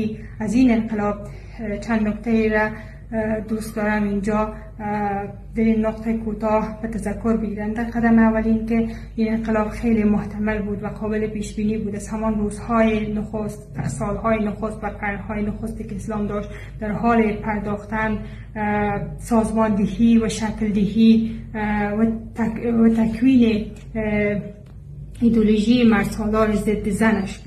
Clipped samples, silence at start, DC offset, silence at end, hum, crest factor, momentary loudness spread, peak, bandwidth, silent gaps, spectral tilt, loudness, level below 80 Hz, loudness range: under 0.1%; 0 s; under 0.1%; 0 s; none; 18 dB; 12 LU; -4 dBFS; 12.5 kHz; none; -7 dB/octave; -21 LUFS; -36 dBFS; 5 LU